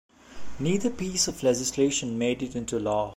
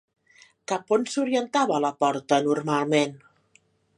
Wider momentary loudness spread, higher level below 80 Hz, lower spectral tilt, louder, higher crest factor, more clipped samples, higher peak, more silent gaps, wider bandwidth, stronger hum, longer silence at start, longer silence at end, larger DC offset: about the same, 7 LU vs 8 LU; first, -52 dBFS vs -76 dBFS; about the same, -4 dB/octave vs -4.5 dB/octave; second, -27 LUFS vs -24 LUFS; about the same, 16 dB vs 20 dB; neither; second, -12 dBFS vs -6 dBFS; neither; first, 16 kHz vs 11 kHz; neither; second, 0.3 s vs 0.7 s; second, 0 s vs 0.8 s; neither